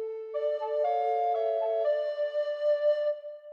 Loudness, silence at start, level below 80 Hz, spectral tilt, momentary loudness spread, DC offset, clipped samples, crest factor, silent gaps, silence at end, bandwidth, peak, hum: -29 LUFS; 0 s; under -90 dBFS; -0.5 dB/octave; 6 LU; under 0.1%; under 0.1%; 12 dB; none; 0 s; 5.6 kHz; -18 dBFS; none